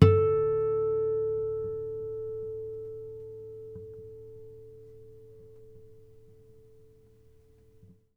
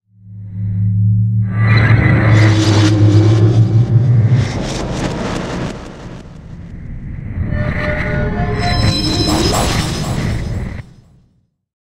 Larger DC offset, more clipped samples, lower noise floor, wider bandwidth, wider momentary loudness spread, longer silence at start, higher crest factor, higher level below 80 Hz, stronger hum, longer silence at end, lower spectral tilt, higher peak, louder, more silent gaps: neither; neither; about the same, -58 dBFS vs -57 dBFS; second, 5.6 kHz vs 13 kHz; first, 26 LU vs 20 LU; second, 0 s vs 0.25 s; first, 28 dB vs 14 dB; second, -56 dBFS vs -28 dBFS; neither; first, 2.15 s vs 1 s; first, -9.5 dB/octave vs -6 dB/octave; about the same, -2 dBFS vs 0 dBFS; second, -30 LUFS vs -14 LUFS; neither